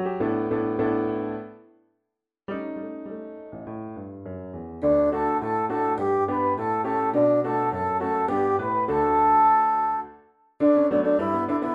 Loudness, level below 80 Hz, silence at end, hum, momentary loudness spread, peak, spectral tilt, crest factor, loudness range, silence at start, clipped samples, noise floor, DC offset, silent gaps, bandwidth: -23 LUFS; -54 dBFS; 0 s; none; 18 LU; -10 dBFS; -9 dB/octave; 14 dB; 12 LU; 0 s; under 0.1%; -81 dBFS; under 0.1%; none; 5.2 kHz